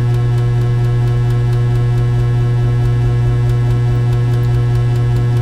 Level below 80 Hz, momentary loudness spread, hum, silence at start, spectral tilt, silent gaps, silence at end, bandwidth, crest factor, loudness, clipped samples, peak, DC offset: -24 dBFS; 0 LU; none; 0 s; -8.5 dB/octave; none; 0 s; 6 kHz; 8 dB; -14 LUFS; under 0.1%; -4 dBFS; under 0.1%